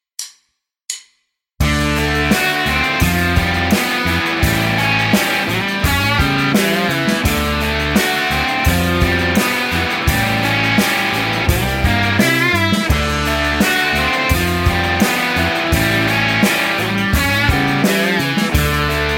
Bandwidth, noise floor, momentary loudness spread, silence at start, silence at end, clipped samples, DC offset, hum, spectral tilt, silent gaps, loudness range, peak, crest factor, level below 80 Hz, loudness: 17 kHz; -68 dBFS; 3 LU; 0.2 s; 0 s; under 0.1%; under 0.1%; none; -4.5 dB/octave; none; 1 LU; -2 dBFS; 14 dB; -26 dBFS; -15 LUFS